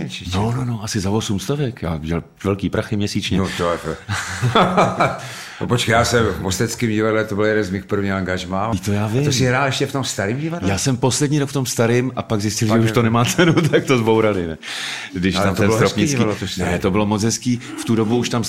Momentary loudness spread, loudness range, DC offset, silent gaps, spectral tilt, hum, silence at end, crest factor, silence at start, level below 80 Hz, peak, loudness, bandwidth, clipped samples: 8 LU; 4 LU; 0.3%; none; -5 dB/octave; none; 0 s; 16 dB; 0 s; -44 dBFS; -2 dBFS; -19 LUFS; 16 kHz; under 0.1%